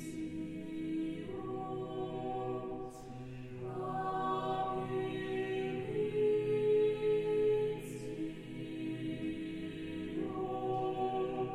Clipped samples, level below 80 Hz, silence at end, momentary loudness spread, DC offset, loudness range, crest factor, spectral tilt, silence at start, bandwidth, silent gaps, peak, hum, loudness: under 0.1%; -60 dBFS; 0 s; 11 LU; under 0.1%; 7 LU; 14 dB; -7 dB/octave; 0 s; 12.5 kHz; none; -24 dBFS; none; -37 LUFS